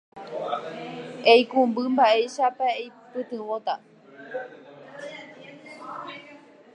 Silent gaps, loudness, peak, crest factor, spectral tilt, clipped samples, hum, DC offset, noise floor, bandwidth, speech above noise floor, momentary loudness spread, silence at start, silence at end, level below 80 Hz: none; -23 LUFS; -4 dBFS; 22 dB; -4 dB/octave; under 0.1%; none; under 0.1%; -49 dBFS; 10 kHz; 26 dB; 24 LU; 0.15 s; 0.4 s; -82 dBFS